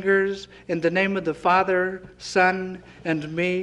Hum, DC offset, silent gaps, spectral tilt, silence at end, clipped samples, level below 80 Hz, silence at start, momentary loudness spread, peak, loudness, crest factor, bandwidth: none; under 0.1%; none; -5.5 dB/octave; 0 s; under 0.1%; -56 dBFS; 0 s; 12 LU; -4 dBFS; -23 LUFS; 18 dB; 10.5 kHz